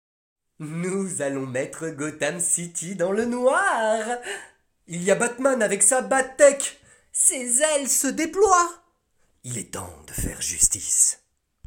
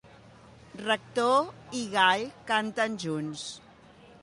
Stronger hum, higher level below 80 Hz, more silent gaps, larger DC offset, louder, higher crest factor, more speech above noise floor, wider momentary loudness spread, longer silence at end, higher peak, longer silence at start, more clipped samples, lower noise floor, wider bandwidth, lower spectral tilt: neither; first, -50 dBFS vs -68 dBFS; neither; neither; first, -21 LUFS vs -28 LUFS; about the same, 20 dB vs 22 dB; first, 43 dB vs 25 dB; about the same, 16 LU vs 15 LU; second, 0.5 s vs 0.65 s; first, -4 dBFS vs -8 dBFS; first, 0.6 s vs 0.05 s; neither; first, -66 dBFS vs -54 dBFS; first, 17 kHz vs 11.5 kHz; about the same, -2.5 dB/octave vs -3.5 dB/octave